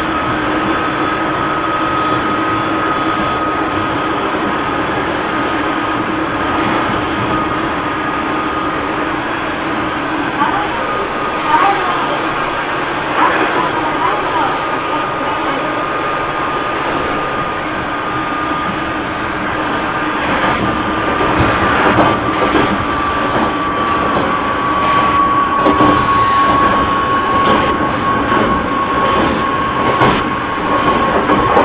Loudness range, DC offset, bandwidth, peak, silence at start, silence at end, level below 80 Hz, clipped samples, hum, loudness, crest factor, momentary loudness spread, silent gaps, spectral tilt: 5 LU; under 0.1%; 4 kHz; 0 dBFS; 0 s; 0 s; -34 dBFS; under 0.1%; none; -15 LUFS; 14 dB; 6 LU; none; -9 dB/octave